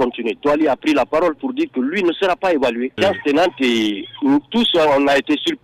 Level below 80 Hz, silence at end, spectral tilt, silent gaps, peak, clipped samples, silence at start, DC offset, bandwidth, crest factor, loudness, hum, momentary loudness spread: -52 dBFS; 0.05 s; -4.5 dB/octave; none; -6 dBFS; under 0.1%; 0 s; under 0.1%; 15 kHz; 10 dB; -17 LUFS; none; 6 LU